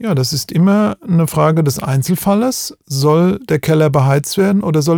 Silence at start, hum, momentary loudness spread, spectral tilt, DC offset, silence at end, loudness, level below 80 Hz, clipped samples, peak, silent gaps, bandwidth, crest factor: 0 s; none; 5 LU; -6 dB/octave; under 0.1%; 0 s; -14 LUFS; -48 dBFS; under 0.1%; 0 dBFS; none; 20 kHz; 12 dB